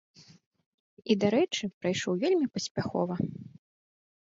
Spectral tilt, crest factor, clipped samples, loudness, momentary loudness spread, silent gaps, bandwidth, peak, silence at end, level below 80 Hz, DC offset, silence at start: -5 dB/octave; 20 dB; under 0.1%; -29 LUFS; 9 LU; 0.46-0.51 s, 0.66-0.97 s, 1.74-1.81 s, 2.71-2.75 s; 7.8 kHz; -12 dBFS; 0.85 s; -66 dBFS; under 0.1%; 0.2 s